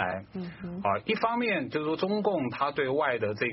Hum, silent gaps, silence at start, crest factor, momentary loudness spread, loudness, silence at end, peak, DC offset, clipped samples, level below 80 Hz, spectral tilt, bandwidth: none; none; 0 s; 16 dB; 9 LU; -29 LUFS; 0 s; -14 dBFS; under 0.1%; under 0.1%; -64 dBFS; -4 dB/octave; 5.8 kHz